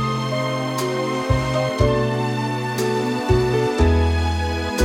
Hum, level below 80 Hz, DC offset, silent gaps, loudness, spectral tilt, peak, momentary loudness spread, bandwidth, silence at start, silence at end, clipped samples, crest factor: none; -30 dBFS; under 0.1%; none; -21 LUFS; -6 dB/octave; -4 dBFS; 5 LU; 16.5 kHz; 0 s; 0 s; under 0.1%; 16 dB